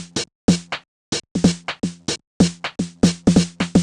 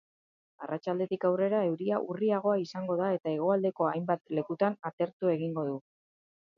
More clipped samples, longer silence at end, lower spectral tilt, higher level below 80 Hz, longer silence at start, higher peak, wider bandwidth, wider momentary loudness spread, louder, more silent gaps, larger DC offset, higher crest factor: neither; second, 0 s vs 0.8 s; second, -5 dB/octave vs -8.5 dB/octave; first, -42 dBFS vs -82 dBFS; second, 0 s vs 0.6 s; first, -2 dBFS vs -14 dBFS; first, 11 kHz vs 7.2 kHz; first, 10 LU vs 7 LU; first, -21 LUFS vs -31 LUFS; first, 0.35-0.48 s, 0.88-1.12 s, 1.31-1.35 s, 2.27-2.40 s vs 4.93-4.98 s, 5.13-5.20 s; neither; about the same, 20 dB vs 18 dB